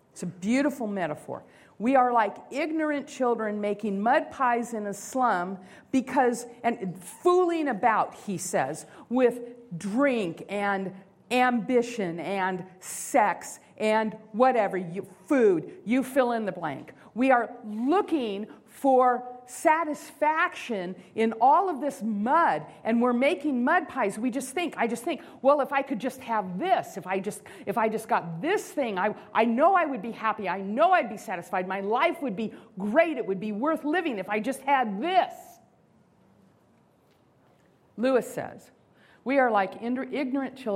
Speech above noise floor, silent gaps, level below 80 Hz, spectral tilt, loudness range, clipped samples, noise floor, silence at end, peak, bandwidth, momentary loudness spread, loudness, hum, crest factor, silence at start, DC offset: 36 dB; none; -74 dBFS; -5 dB/octave; 4 LU; under 0.1%; -63 dBFS; 0 s; -8 dBFS; 16 kHz; 12 LU; -27 LUFS; none; 20 dB; 0.15 s; under 0.1%